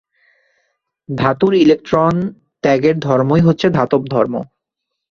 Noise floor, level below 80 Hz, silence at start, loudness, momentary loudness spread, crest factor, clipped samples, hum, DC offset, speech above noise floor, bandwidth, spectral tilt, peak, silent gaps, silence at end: -78 dBFS; -48 dBFS; 1.1 s; -15 LUFS; 11 LU; 14 dB; under 0.1%; none; under 0.1%; 64 dB; 7.2 kHz; -8 dB/octave; -2 dBFS; none; 0.65 s